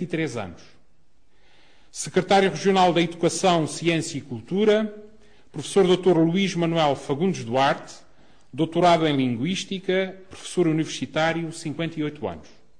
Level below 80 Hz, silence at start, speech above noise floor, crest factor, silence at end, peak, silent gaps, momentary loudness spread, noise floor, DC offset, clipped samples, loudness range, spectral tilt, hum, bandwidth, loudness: -58 dBFS; 0 s; 41 dB; 16 dB; 0.4 s; -8 dBFS; none; 15 LU; -64 dBFS; 0.4%; under 0.1%; 2 LU; -5 dB/octave; none; 10 kHz; -23 LUFS